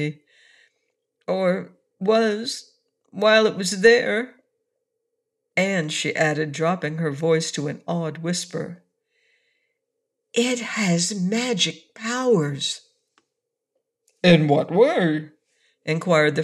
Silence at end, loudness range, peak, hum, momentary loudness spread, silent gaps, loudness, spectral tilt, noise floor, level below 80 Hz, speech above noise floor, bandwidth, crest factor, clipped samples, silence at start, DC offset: 0 s; 6 LU; -4 dBFS; none; 13 LU; none; -21 LUFS; -4.5 dB/octave; -81 dBFS; -66 dBFS; 60 dB; 12.5 kHz; 20 dB; under 0.1%; 0 s; under 0.1%